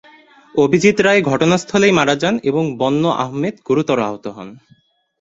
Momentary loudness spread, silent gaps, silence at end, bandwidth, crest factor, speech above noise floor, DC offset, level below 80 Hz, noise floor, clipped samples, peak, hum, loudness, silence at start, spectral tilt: 11 LU; none; 0.65 s; 8 kHz; 14 dB; 31 dB; under 0.1%; -54 dBFS; -46 dBFS; under 0.1%; -2 dBFS; none; -16 LUFS; 0.55 s; -5.5 dB/octave